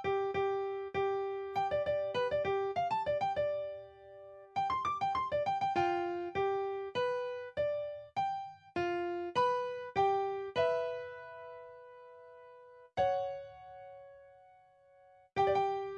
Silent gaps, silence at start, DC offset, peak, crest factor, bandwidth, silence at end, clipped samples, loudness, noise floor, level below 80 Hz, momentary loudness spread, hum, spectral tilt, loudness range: none; 0 s; under 0.1%; -18 dBFS; 18 dB; 8.6 kHz; 0 s; under 0.1%; -35 LUFS; -63 dBFS; -70 dBFS; 20 LU; none; -6 dB/octave; 7 LU